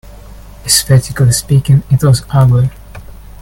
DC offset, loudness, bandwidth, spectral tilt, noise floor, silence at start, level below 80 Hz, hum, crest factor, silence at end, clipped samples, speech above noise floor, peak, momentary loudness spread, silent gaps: under 0.1%; -11 LUFS; 17 kHz; -5 dB/octave; -32 dBFS; 0.4 s; -32 dBFS; none; 12 dB; 0.3 s; under 0.1%; 23 dB; 0 dBFS; 4 LU; none